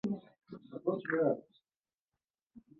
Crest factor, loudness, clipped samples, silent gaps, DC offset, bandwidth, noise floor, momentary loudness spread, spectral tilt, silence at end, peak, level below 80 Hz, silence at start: 20 dB; -35 LUFS; under 0.1%; 1.94-2.08 s, 2.30-2.34 s, 2.43-2.47 s; under 0.1%; 6.6 kHz; under -90 dBFS; 20 LU; -7 dB/octave; 0.2 s; -18 dBFS; -80 dBFS; 0.05 s